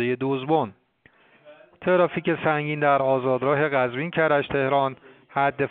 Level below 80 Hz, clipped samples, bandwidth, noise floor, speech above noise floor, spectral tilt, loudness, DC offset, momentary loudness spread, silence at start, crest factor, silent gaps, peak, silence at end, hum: -62 dBFS; under 0.1%; 4.4 kHz; -59 dBFS; 36 dB; -4.5 dB/octave; -23 LUFS; under 0.1%; 5 LU; 0 s; 18 dB; none; -6 dBFS; 0 s; none